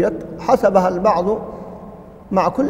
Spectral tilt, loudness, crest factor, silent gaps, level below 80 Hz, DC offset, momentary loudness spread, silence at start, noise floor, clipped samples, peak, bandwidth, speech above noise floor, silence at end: -7 dB/octave; -17 LUFS; 18 dB; none; -46 dBFS; under 0.1%; 20 LU; 0 s; -37 dBFS; under 0.1%; 0 dBFS; 16 kHz; 21 dB; 0 s